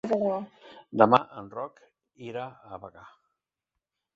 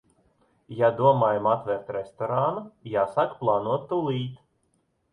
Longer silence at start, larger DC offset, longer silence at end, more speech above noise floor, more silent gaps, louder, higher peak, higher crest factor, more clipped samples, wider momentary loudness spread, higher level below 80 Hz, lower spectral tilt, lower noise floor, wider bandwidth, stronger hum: second, 0.05 s vs 0.7 s; neither; first, 1.05 s vs 0.75 s; first, 59 dB vs 46 dB; neither; about the same, -26 LUFS vs -25 LUFS; first, -2 dBFS vs -8 dBFS; first, 26 dB vs 20 dB; neither; first, 24 LU vs 12 LU; about the same, -70 dBFS vs -66 dBFS; about the same, -7.5 dB/octave vs -8.5 dB/octave; first, -87 dBFS vs -71 dBFS; second, 7.6 kHz vs 9.8 kHz; neither